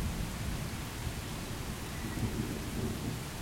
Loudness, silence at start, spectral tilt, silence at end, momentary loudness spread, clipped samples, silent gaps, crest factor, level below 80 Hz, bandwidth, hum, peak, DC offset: -38 LUFS; 0 s; -5 dB/octave; 0 s; 4 LU; under 0.1%; none; 16 dB; -44 dBFS; 16.5 kHz; none; -22 dBFS; under 0.1%